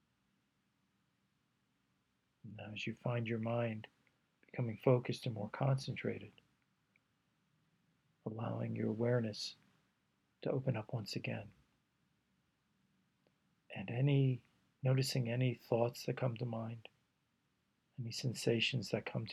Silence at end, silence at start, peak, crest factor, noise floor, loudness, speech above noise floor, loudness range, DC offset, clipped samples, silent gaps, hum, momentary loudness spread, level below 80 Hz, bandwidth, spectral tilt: 0 s; 2.45 s; -18 dBFS; 22 dB; -81 dBFS; -39 LUFS; 44 dB; 7 LU; under 0.1%; under 0.1%; none; none; 15 LU; -80 dBFS; 13 kHz; -6 dB/octave